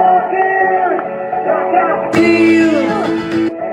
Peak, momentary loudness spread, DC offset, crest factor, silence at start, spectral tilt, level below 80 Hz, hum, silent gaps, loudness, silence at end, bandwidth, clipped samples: -2 dBFS; 7 LU; under 0.1%; 12 dB; 0 s; -6 dB/octave; -52 dBFS; none; none; -13 LUFS; 0 s; 10 kHz; under 0.1%